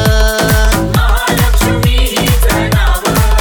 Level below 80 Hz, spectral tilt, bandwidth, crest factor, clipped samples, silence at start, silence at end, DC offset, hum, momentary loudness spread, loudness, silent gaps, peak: -12 dBFS; -4.5 dB/octave; over 20 kHz; 10 dB; under 0.1%; 0 s; 0 s; under 0.1%; none; 1 LU; -11 LUFS; none; 0 dBFS